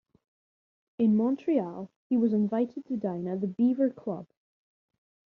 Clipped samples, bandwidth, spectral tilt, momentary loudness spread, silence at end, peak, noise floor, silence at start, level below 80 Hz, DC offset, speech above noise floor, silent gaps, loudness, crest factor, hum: under 0.1%; 4.2 kHz; -9.5 dB/octave; 12 LU; 1.1 s; -14 dBFS; under -90 dBFS; 1 s; -74 dBFS; under 0.1%; over 63 dB; 1.96-2.10 s; -28 LUFS; 16 dB; none